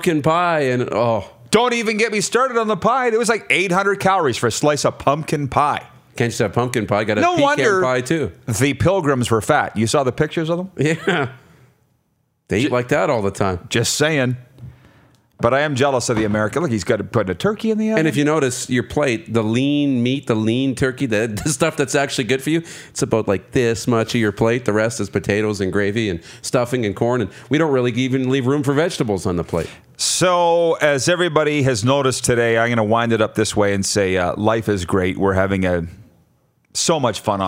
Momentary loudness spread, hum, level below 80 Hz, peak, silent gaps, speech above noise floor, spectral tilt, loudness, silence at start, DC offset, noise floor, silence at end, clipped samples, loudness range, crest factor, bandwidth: 5 LU; none; -50 dBFS; 0 dBFS; none; 48 dB; -5 dB/octave; -18 LUFS; 0 s; under 0.1%; -66 dBFS; 0 s; under 0.1%; 3 LU; 18 dB; 16 kHz